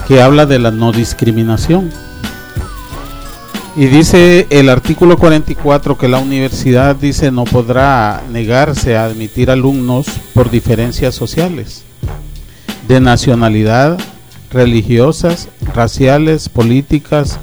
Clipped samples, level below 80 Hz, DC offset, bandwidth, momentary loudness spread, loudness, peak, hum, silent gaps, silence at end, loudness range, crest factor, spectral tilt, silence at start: 1%; -26 dBFS; under 0.1%; over 20 kHz; 18 LU; -10 LUFS; 0 dBFS; none; none; 0 s; 5 LU; 10 dB; -6.5 dB/octave; 0 s